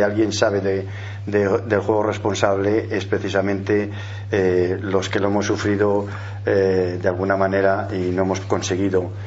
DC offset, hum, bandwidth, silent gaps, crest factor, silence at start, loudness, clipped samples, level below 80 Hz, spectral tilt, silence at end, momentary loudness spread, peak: under 0.1%; none; 8 kHz; none; 20 dB; 0 s; -20 LUFS; under 0.1%; -54 dBFS; -6 dB/octave; 0 s; 5 LU; 0 dBFS